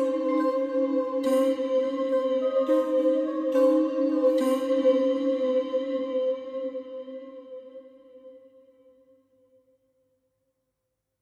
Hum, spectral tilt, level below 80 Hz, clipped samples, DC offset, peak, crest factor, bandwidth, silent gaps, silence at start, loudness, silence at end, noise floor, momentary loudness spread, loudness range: none; -4.5 dB/octave; -80 dBFS; under 0.1%; under 0.1%; -12 dBFS; 14 dB; 14 kHz; none; 0 s; -25 LUFS; 2.85 s; -81 dBFS; 16 LU; 15 LU